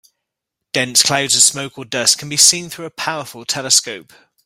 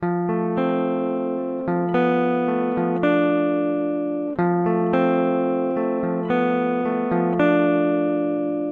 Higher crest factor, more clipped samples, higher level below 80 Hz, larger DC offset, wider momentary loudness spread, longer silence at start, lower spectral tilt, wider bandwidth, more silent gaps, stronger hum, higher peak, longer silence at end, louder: about the same, 18 dB vs 14 dB; neither; about the same, -62 dBFS vs -60 dBFS; neither; first, 16 LU vs 5 LU; first, 0.75 s vs 0 s; second, -0.5 dB/octave vs -10 dB/octave; first, over 20 kHz vs 4.5 kHz; neither; neither; first, 0 dBFS vs -6 dBFS; first, 0.45 s vs 0 s; first, -14 LUFS vs -21 LUFS